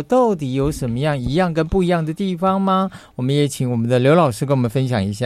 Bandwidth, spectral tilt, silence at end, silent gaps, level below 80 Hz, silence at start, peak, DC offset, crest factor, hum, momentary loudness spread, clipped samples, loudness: 14.5 kHz; -7 dB/octave; 0 s; none; -40 dBFS; 0 s; -2 dBFS; under 0.1%; 16 dB; none; 6 LU; under 0.1%; -18 LUFS